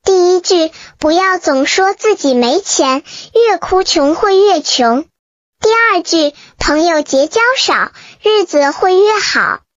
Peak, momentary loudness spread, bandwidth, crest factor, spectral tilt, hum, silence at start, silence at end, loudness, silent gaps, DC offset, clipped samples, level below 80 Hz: -2 dBFS; 7 LU; 7.8 kHz; 10 dB; -2 dB/octave; none; 0.05 s; 0.2 s; -12 LUFS; 5.19-5.53 s; under 0.1%; under 0.1%; -40 dBFS